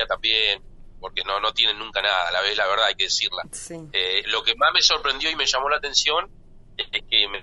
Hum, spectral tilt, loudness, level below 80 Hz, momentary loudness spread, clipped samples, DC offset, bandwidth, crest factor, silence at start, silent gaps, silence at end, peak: none; 0 dB/octave; -21 LUFS; -46 dBFS; 13 LU; under 0.1%; under 0.1%; 11.5 kHz; 20 dB; 0 s; none; 0 s; -2 dBFS